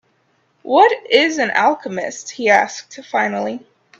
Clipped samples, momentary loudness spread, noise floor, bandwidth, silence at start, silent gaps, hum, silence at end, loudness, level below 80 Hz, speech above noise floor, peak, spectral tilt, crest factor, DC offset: under 0.1%; 13 LU; -62 dBFS; 8.2 kHz; 0.65 s; none; none; 0.4 s; -16 LUFS; -68 dBFS; 45 dB; 0 dBFS; -3 dB/octave; 18 dB; under 0.1%